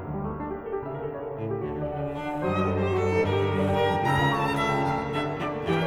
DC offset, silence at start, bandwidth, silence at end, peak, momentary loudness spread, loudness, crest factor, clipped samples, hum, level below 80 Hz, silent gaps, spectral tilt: under 0.1%; 0 s; 15.5 kHz; 0 s; -12 dBFS; 9 LU; -27 LUFS; 16 dB; under 0.1%; none; -48 dBFS; none; -7 dB/octave